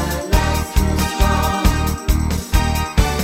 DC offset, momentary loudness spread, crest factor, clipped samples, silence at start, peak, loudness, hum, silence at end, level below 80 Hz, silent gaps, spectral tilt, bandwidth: under 0.1%; 3 LU; 16 dB; under 0.1%; 0 s; 0 dBFS; -18 LUFS; none; 0 s; -20 dBFS; none; -5 dB/octave; 16.5 kHz